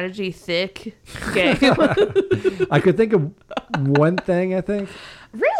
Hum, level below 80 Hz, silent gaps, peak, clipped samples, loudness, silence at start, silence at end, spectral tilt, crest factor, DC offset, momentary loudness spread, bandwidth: none; -46 dBFS; none; -4 dBFS; under 0.1%; -19 LUFS; 0 s; 0 s; -6.5 dB/octave; 14 dB; under 0.1%; 16 LU; 13.5 kHz